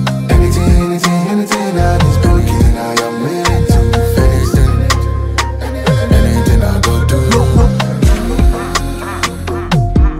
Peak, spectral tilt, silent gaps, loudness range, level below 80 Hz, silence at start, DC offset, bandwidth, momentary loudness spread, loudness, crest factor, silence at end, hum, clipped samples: 0 dBFS; -6 dB/octave; none; 1 LU; -14 dBFS; 0 s; under 0.1%; 16 kHz; 6 LU; -12 LUFS; 10 dB; 0 s; none; under 0.1%